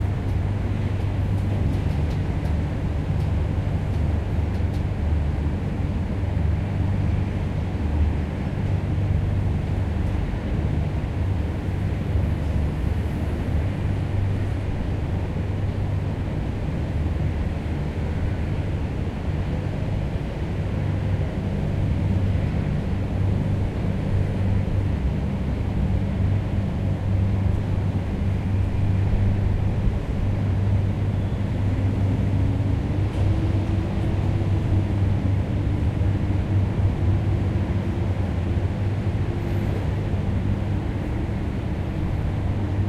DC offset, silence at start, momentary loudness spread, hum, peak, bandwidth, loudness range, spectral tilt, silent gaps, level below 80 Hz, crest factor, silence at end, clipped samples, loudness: under 0.1%; 0 s; 4 LU; none; -8 dBFS; 8 kHz; 3 LU; -8.5 dB/octave; none; -30 dBFS; 14 dB; 0 s; under 0.1%; -25 LUFS